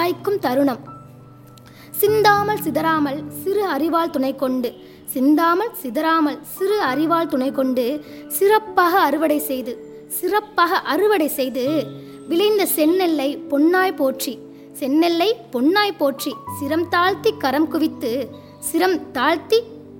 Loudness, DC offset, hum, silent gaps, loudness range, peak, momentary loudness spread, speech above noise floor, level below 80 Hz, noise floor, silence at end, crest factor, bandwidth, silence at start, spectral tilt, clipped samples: -19 LUFS; under 0.1%; none; none; 2 LU; -2 dBFS; 11 LU; 24 dB; -62 dBFS; -43 dBFS; 0 s; 18 dB; 17 kHz; 0 s; -4 dB/octave; under 0.1%